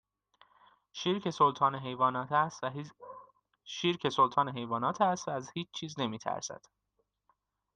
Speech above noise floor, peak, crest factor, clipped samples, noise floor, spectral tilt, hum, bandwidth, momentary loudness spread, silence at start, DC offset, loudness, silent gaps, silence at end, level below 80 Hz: 49 dB; -14 dBFS; 20 dB; under 0.1%; -80 dBFS; -4.5 dB/octave; none; 9.4 kHz; 17 LU; 0.95 s; under 0.1%; -32 LUFS; none; 1.2 s; -76 dBFS